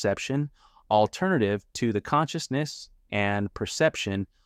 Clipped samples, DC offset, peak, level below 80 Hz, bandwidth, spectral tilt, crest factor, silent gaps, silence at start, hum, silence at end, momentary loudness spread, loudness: under 0.1%; under 0.1%; -8 dBFS; -56 dBFS; 15 kHz; -5 dB/octave; 18 dB; none; 0 s; none; 0.2 s; 7 LU; -27 LUFS